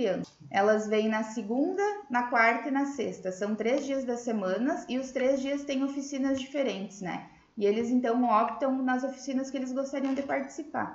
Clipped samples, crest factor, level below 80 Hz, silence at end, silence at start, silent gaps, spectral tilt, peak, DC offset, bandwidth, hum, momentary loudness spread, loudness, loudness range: under 0.1%; 18 dB; -70 dBFS; 0 s; 0 s; none; -5 dB/octave; -10 dBFS; under 0.1%; 8 kHz; none; 9 LU; -29 LUFS; 3 LU